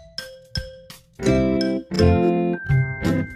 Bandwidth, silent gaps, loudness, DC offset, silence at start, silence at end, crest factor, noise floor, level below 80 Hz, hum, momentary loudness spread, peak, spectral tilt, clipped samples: 14.5 kHz; none; -21 LUFS; under 0.1%; 0 s; 0 s; 18 dB; -44 dBFS; -36 dBFS; none; 14 LU; -4 dBFS; -7 dB/octave; under 0.1%